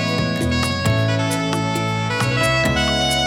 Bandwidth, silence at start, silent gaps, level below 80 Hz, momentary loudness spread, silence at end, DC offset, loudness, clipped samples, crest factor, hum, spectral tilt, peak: 17.5 kHz; 0 s; none; -34 dBFS; 4 LU; 0 s; under 0.1%; -19 LUFS; under 0.1%; 12 dB; none; -4.5 dB/octave; -8 dBFS